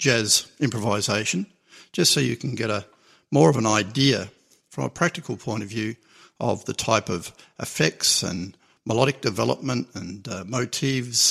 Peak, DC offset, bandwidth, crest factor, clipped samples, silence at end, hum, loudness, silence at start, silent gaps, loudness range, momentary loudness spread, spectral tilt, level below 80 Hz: -2 dBFS; under 0.1%; 15 kHz; 22 dB; under 0.1%; 0 s; none; -23 LUFS; 0 s; none; 4 LU; 15 LU; -3.5 dB/octave; -60 dBFS